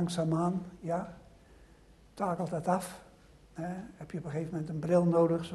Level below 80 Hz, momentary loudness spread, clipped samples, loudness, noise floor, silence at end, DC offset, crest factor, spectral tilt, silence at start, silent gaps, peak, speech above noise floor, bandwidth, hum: -62 dBFS; 16 LU; under 0.1%; -33 LUFS; -59 dBFS; 0 s; under 0.1%; 18 dB; -7.5 dB/octave; 0 s; none; -16 dBFS; 27 dB; 12.5 kHz; none